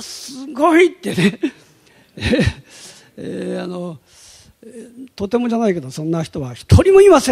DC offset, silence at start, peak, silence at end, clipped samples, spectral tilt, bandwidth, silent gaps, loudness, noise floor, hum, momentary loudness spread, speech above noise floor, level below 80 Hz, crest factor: under 0.1%; 0 s; 0 dBFS; 0 s; under 0.1%; -6 dB/octave; 14.5 kHz; none; -16 LUFS; -51 dBFS; none; 24 LU; 35 dB; -36 dBFS; 16 dB